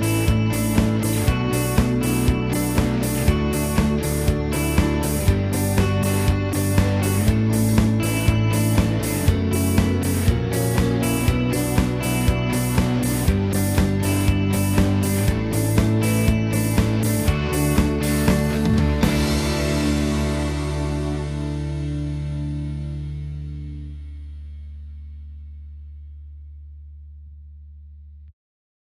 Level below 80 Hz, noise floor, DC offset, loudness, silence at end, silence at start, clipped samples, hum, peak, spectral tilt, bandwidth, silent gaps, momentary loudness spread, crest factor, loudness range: -28 dBFS; -42 dBFS; under 0.1%; -21 LUFS; 0.55 s; 0 s; under 0.1%; none; -4 dBFS; -6 dB/octave; 16 kHz; none; 16 LU; 16 dB; 14 LU